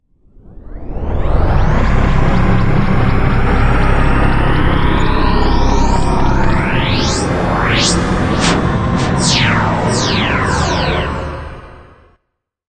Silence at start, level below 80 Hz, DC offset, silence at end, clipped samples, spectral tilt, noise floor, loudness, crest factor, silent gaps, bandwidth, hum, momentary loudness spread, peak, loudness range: 0.45 s; -18 dBFS; under 0.1%; 0.9 s; under 0.1%; -5 dB/octave; -71 dBFS; -14 LUFS; 12 dB; none; 9.2 kHz; none; 6 LU; 0 dBFS; 2 LU